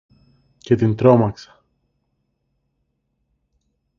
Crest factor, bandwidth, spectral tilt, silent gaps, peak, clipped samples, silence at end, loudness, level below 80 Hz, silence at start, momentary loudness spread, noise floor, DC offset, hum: 22 dB; 7.2 kHz; -9 dB/octave; none; 0 dBFS; under 0.1%; 2.65 s; -17 LUFS; -52 dBFS; 0.65 s; 11 LU; -72 dBFS; under 0.1%; none